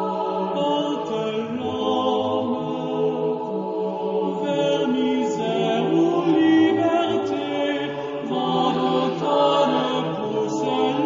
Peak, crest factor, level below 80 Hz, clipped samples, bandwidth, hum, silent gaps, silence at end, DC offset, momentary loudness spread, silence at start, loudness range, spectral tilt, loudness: -6 dBFS; 14 dB; -64 dBFS; under 0.1%; 7.6 kHz; none; none; 0 s; under 0.1%; 7 LU; 0 s; 4 LU; -6 dB/octave; -22 LUFS